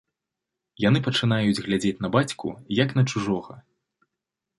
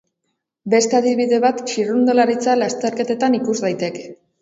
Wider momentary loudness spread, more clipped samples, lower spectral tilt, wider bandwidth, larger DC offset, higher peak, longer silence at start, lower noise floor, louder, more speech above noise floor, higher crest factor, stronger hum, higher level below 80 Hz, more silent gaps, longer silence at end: about the same, 7 LU vs 8 LU; neither; first, -6 dB/octave vs -4 dB/octave; first, 11.5 kHz vs 8 kHz; neither; about the same, -4 dBFS vs -2 dBFS; first, 0.8 s vs 0.65 s; first, -85 dBFS vs -75 dBFS; second, -24 LUFS vs -18 LUFS; first, 62 dB vs 57 dB; about the same, 20 dB vs 16 dB; neither; first, -56 dBFS vs -68 dBFS; neither; first, 1 s vs 0.25 s